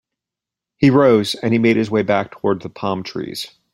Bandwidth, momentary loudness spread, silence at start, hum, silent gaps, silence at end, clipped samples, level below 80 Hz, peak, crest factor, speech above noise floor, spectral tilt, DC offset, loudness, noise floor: 16 kHz; 13 LU; 0.8 s; none; none; 0.25 s; under 0.1%; -56 dBFS; -2 dBFS; 16 dB; 69 dB; -6.5 dB/octave; under 0.1%; -17 LUFS; -86 dBFS